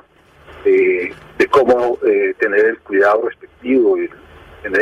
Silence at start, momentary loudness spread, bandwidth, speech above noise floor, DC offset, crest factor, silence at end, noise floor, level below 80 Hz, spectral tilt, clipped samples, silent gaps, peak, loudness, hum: 0.5 s; 12 LU; 8.6 kHz; 32 dB; under 0.1%; 12 dB; 0 s; -46 dBFS; -50 dBFS; -6 dB/octave; under 0.1%; none; -4 dBFS; -15 LUFS; none